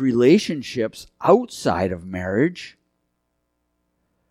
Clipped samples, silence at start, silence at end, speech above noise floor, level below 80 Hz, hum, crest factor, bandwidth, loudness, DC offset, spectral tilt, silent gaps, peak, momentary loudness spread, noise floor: under 0.1%; 0 s; 1.6 s; 53 dB; -56 dBFS; 60 Hz at -50 dBFS; 20 dB; 14.5 kHz; -21 LUFS; under 0.1%; -6 dB/octave; none; -2 dBFS; 12 LU; -73 dBFS